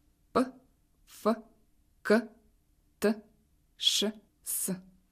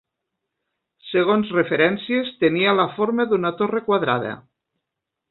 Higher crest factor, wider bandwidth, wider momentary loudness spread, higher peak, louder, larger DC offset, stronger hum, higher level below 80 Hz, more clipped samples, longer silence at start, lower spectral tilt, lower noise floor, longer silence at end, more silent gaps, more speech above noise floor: about the same, 22 dB vs 18 dB; first, 15.5 kHz vs 4.3 kHz; first, 14 LU vs 6 LU; second, -12 dBFS vs -4 dBFS; second, -31 LUFS vs -20 LUFS; neither; neither; about the same, -68 dBFS vs -64 dBFS; neither; second, 0.35 s vs 1.05 s; second, -3 dB/octave vs -10.5 dB/octave; second, -68 dBFS vs -82 dBFS; second, 0.3 s vs 0.9 s; neither; second, 38 dB vs 63 dB